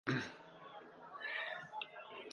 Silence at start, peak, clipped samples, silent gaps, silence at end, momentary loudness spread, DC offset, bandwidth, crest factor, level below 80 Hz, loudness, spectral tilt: 0.05 s; -22 dBFS; under 0.1%; none; 0 s; 14 LU; under 0.1%; 11 kHz; 24 dB; -80 dBFS; -46 LUFS; -5.5 dB/octave